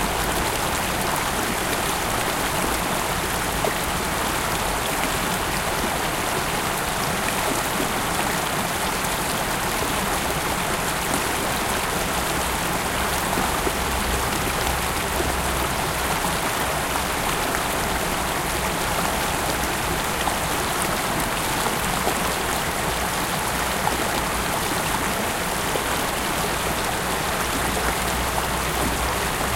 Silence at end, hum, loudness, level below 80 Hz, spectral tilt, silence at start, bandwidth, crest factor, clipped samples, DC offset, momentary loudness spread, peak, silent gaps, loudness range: 0 s; none; -23 LUFS; -36 dBFS; -3 dB/octave; 0 s; 17 kHz; 18 dB; under 0.1%; under 0.1%; 1 LU; -4 dBFS; none; 0 LU